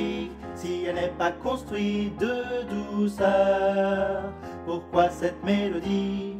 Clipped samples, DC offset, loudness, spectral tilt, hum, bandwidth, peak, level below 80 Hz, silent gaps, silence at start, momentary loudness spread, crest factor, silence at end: under 0.1%; under 0.1%; -27 LUFS; -6.5 dB/octave; none; 14 kHz; -8 dBFS; -50 dBFS; none; 0 s; 11 LU; 18 dB; 0 s